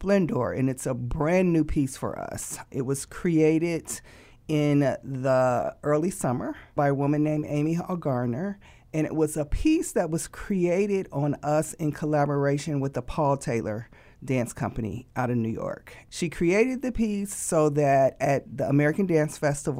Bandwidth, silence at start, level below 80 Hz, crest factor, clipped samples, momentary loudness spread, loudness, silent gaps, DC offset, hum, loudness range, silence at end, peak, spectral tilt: 16 kHz; 0 s; -44 dBFS; 16 dB; under 0.1%; 10 LU; -26 LUFS; none; under 0.1%; none; 4 LU; 0 s; -10 dBFS; -6.5 dB/octave